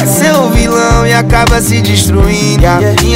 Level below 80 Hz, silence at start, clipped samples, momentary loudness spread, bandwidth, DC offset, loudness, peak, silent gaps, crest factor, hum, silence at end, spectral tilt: -16 dBFS; 0 s; 0.3%; 1 LU; 16.5 kHz; under 0.1%; -8 LUFS; 0 dBFS; none; 8 dB; none; 0 s; -4.5 dB/octave